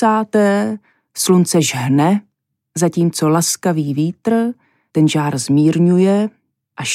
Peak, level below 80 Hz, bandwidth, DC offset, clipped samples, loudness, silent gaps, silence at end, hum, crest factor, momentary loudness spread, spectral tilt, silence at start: -2 dBFS; -66 dBFS; 15.5 kHz; under 0.1%; under 0.1%; -16 LUFS; none; 0 s; none; 14 dB; 10 LU; -5.5 dB/octave; 0 s